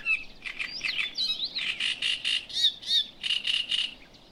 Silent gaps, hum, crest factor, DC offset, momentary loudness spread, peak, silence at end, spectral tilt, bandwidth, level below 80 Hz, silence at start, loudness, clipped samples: none; none; 18 dB; under 0.1%; 7 LU; -12 dBFS; 0.05 s; 1 dB/octave; 16 kHz; -58 dBFS; 0 s; -27 LUFS; under 0.1%